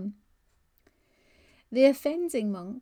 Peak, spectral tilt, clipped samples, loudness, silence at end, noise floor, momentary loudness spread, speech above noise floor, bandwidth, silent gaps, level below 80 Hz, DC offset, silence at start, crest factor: -8 dBFS; -5.5 dB/octave; under 0.1%; -26 LUFS; 0 s; -69 dBFS; 11 LU; 43 dB; 19.5 kHz; none; -70 dBFS; under 0.1%; 0 s; 20 dB